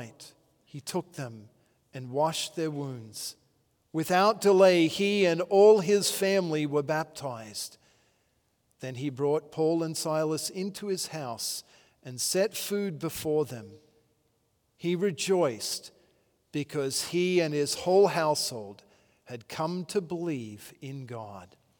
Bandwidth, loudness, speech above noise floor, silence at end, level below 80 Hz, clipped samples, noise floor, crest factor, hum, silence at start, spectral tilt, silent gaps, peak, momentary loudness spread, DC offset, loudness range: over 20 kHz; -28 LUFS; 45 dB; 0.35 s; -74 dBFS; under 0.1%; -73 dBFS; 20 dB; none; 0 s; -4.5 dB/octave; none; -8 dBFS; 19 LU; under 0.1%; 10 LU